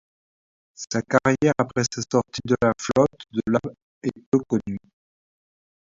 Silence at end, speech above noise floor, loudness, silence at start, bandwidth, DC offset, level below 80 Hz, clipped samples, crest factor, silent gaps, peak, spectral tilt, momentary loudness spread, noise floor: 1.05 s; over 67 dB; -23 LUFS; 0.8 s; 7.8 kHz; under 0.1%; -54 dBFS; under 0.1%; 22 dB; 3.82-4.01 s, 4.26-4.32 s; -2 dBFS; -5.5 dB/octave; 11 LU; under -90 dBFS